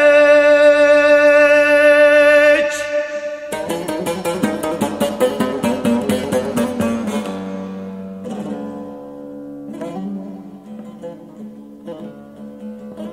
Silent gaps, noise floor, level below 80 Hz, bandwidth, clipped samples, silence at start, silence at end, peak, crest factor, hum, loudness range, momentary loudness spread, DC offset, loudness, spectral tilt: none; -35 dBFS; -54 dBFS; 15.5 kHz; under 0.1%; 0 s; 0 s; -2 dBFS; 14 dB; none; 20 LU; 24 LU; under 0.1%; -14 LUFS; -4.5 dB/octave